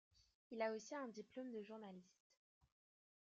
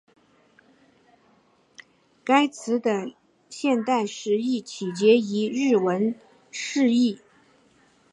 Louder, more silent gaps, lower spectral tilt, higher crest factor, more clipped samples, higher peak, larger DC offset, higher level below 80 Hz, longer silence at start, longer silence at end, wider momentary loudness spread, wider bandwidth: second, -51 LUFS vs -23 LUFS; first, 0.35-0.50 s vs none; about the same, -4 dB/octave vs -5 dB/octave; about the same, 22 dB vs 18 dB; neither; second, -30 dBFS vs -6 dBFS; neither; second, under -90 dBFS vs -78 dBFS; second, 0.2 s vs 2.25 s; first, 1.3 s vs 0.95 s; second, 12 LU vs 16 LU; second, 7.6 kHz vs 10.5 kHz